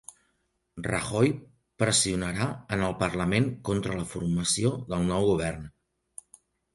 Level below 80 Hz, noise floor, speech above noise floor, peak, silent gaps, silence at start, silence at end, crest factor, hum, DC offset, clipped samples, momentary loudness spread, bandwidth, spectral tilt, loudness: -50 dBFS; -75 dBFS; 48 dB; -10 dBFS; none; 0.75 s; 1.05 s; 20 dB; none; under 0.1%; under 0.1%; 20 LU; 11.5 kHz; -4.5 dB/octave; -27 LUFS